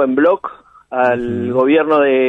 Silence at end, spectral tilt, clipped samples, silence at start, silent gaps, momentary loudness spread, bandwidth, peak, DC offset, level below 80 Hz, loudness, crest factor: 0 s; -8 dB/octave; under 0.1%; 0 s; none; 10 LU; 5.2 kHz; -2 dBFS; under 0.1%; -52 dBFS; -15 LUFS; 12 dB